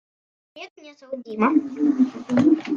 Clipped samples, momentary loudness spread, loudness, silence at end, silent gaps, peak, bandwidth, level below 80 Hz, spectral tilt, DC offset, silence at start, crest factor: under 0.1%; 22 LU; -21 LUFS; 0 s; 0.70-0.76 s; -6 dBFS; 7.2 kHz; -70 dBFS; -7 dB/octave; under 0.1%; 0.55 s; 16 dB